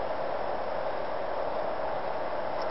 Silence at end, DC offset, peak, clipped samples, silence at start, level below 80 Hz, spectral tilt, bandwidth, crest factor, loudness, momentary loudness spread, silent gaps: 0 s; 2%; -20 dBFS; under 0.1%; 0 s; -58 dBFS; -3 dB/octave; 5.8 kHz; 12 dB; -33 LUFS; 1 LU; none